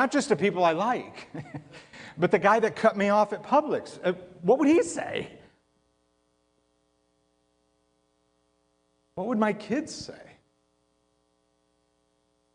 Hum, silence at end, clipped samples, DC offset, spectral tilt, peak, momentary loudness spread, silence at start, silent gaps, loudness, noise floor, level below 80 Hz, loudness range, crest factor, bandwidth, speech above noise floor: none; 2.3 s; under 0.1%; under 0.1%; -5.5 dB/octave; -8 dBFS; 20 LU; 0 s; none; -25 LUFS; -71 dBFS; -70 dBFS; 11 LU; 22 dB; 10.5 kHz; 46 dB